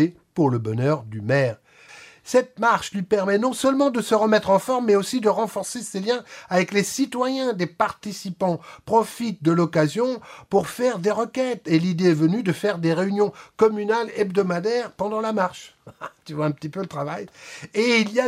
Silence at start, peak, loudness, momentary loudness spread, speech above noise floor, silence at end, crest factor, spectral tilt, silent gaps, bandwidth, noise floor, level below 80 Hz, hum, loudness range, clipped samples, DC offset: 0 s; -4 dBFS; -22 LUFS; 10 LU; 25 dB; 0 s; 18 dB; -5.5 dB/octave; none; 16 kHz; -47 dBFS; -64 dBFS; none; 4 LU; under 0.1%; under 0.1%